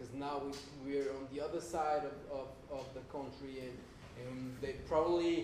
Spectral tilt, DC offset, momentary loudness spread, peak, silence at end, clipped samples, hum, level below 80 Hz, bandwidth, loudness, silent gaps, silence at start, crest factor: -5.5 dB/octave; under 0.1%; 13 LU; -20 dBFS; 0 s; under 0.1%; none; -60 dBFS; 14 kHz; -41 LUFS; none; 0 s; 20 dB